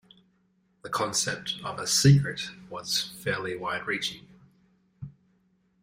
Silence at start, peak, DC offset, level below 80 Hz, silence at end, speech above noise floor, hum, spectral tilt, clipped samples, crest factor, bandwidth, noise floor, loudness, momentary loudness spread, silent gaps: 0.85 s; -6 dBFS; under 0.1%; -58 dBFS; 0.7 s; 42 dB; none; -4 dB/octave; under 0.1%; 22 dB; 16 kHz; -69 dBFS; -27 LUFS; 25 LU; none